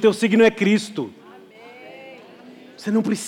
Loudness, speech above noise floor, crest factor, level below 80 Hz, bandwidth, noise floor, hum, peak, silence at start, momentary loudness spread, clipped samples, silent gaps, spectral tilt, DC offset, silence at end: -19 LUFS; 26 dB; 16 dB; -68 dBFS; 14 kHz; -44 dBFS; none; -6 dBFS; 0 s; 25 LU; under 0.1%; none; -5.5 dB/octave; under 0.1%; 0 s